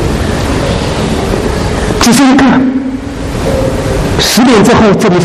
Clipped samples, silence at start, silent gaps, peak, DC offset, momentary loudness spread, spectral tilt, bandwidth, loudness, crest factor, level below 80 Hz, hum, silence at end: 0.3%; 0 s; none; 0 dBFS; under 0.1%; 9 LU; -5 dB/octave; 15 kHz; -9 LUFS; 8 dB; -20 dBFS; none; 0 s